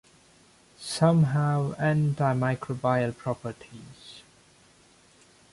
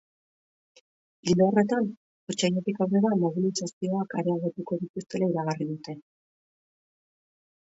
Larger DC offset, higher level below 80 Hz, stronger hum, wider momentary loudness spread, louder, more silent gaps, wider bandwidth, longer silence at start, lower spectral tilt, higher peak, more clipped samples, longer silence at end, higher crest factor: neither; first, -62 dBFS vs -70 dBFS; neither; first, 23 LU vs 12 LU; about the same, -26 LUFS vs -27 LUFS; second, none vs 1.97-2.27 s, 3.73-3.81 s, 4.90-4.94 s; first, 11.5 kHz vs 8 kHz; second, 0.8 s vs 1.25 s; about the same, -7 dB/octave vs -6 dB/octave; about the same, -10 dBFS vs -8 dBFS; neither; second, 1.3 s vs 1.65 s; about the same, 18 dB vs 20 dB